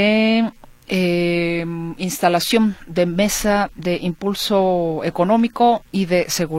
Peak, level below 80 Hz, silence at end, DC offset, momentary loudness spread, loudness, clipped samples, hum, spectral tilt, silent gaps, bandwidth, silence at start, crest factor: 0 dBFS; -44 dBFS; 0 s; under 0.1%; 7 LU; -19 LUFS; under 0.1%; none; -5 dB/octave; none; 16.5 kHz; 0 s; 18 dB